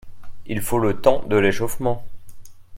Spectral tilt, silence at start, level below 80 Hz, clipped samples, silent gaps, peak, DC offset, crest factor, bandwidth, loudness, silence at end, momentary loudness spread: -5.5 dB/octave; 0.05 s; -40 dBFS; under 0.1%; none; 0 dBFS; under 0.1%; 20 dB; 16.5 kHz; -21 LUFS; 0 s; 11 LU